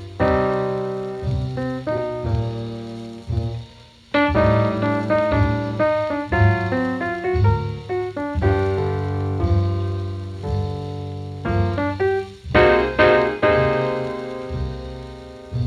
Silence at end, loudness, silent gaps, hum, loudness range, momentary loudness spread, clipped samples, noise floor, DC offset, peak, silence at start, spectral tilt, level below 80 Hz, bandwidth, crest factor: 0 s; -21 LUFS; none; none; 5 LU; 13 LU; under 0.1%; -45 dBFS; under 0.1%; -4 dBFS; 0 s; -8 dB/octave; -34 dBFS; 7.4 kHz; 18 dB